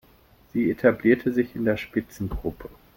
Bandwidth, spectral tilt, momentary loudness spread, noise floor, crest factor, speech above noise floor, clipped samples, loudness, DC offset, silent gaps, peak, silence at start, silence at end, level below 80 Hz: 17 kHz; -7.5 dB/octave; 12 LU; -56 dBFS; 20 dB; 32 dB; under 0.1%; -25 LUFS; under 0.1%; none; -6 dBFS; 0.55 s; 0.3 s; -44 dBFS